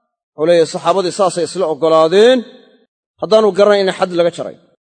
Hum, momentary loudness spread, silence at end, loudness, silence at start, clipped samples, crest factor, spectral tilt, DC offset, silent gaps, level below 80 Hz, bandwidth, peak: none; 8 LU; 0.3 s; -13 LUFS; 0.4 s; 0.1%; 14 dB; -4.5 dB/octave; under 0.1%; 2.88-3.14 s; -64 dBFS; 9.4 kHz; 0 dBFS